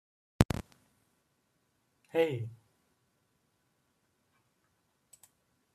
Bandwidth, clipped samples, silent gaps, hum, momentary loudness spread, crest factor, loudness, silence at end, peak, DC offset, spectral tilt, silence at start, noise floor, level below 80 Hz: 14 kHz; under 0.1%; 0.45-0.49 s; none; 10 LU; 38 dB; -33 LUFS; 3.2 s; -2 dBFS; under 0.1%; -6.5 dB/octave; 0.4 s; -76 dBFS; -52 dBFS